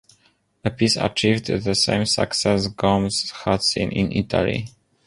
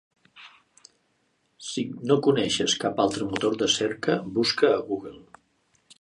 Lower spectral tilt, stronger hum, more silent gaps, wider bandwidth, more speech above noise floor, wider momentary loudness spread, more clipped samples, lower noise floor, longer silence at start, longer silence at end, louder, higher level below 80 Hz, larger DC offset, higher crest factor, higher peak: about the same, -4.5 dB/octave vs -4 dB/octave; neither; neither; about the same, 11.5 kHz vs 11 kHz; second, 41 dB vs 46 dB; second, 5 LU vs 11 LU; neither; second, -62 dBFS vs -70 dBFS; first, 0.65 s vs 0.35 s; second, 0.4 s vs 0.8 s; first, -21 LUFS vs -25 LUFS; first, -44 dBFS vs -62 dBFS; neither; about the same, 18 dB vs 20 dB; first, -2 dBFS vs -6 dBFS